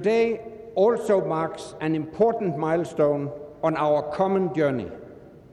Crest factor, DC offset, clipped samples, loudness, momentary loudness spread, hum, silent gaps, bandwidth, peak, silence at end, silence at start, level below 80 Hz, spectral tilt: 16 dB; under 0.1%; under 0.1%; -24 LUFS; 9 LU; none; none; 12 kHz; -8 dBFS; 0.25 s; 0 s; -60 dBFS; -7.5 dB/octave